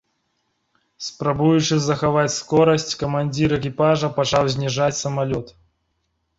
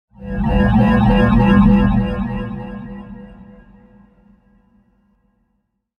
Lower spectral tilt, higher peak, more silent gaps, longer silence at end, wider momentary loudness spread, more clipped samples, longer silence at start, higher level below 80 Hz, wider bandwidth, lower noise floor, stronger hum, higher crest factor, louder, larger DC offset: second, -5 dB/octave vs -9.5 dB/octave; about the same, -4 dBFS vs -2 dBFS; neither; second, 0.9 s vs 2.65 s; second, 7 LU vs 21 LU; neither; first, 1 s vs 0.2 s; second, -50 dBFS vs -26 dBFS; first, 8 kHz vs 5.2 kHz; about the same, -71 dBFS vs -69 dBFS; neither; about the same, 18 dB vs 16 dB; second, -20 LUFS vs -15 LUFS; neither